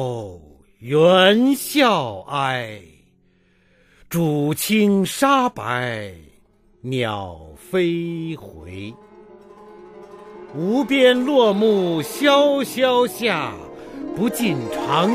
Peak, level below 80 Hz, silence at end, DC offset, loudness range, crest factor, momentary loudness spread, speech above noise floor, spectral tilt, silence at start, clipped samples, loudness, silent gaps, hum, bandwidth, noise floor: -2 dBFS; -56 dBFS; 0 s; under 0.1%; 9 LU; 18 dB; 20 LU; 40 dB; -5 dB/octave; 0 s; under 0.1%; -19 LUFS; none; none; 15.5 kHz; -59 dBFS